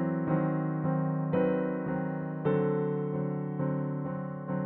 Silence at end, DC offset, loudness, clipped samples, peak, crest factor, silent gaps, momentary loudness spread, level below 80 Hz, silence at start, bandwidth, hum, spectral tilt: 0 s; under 0.1%; -31 LUFS; under 0.1%; -16 dBFS; 14 dB; none; 6 LU; -64 dBFS; 0 s; 3.8 kHz; none; -9.5 dB/octave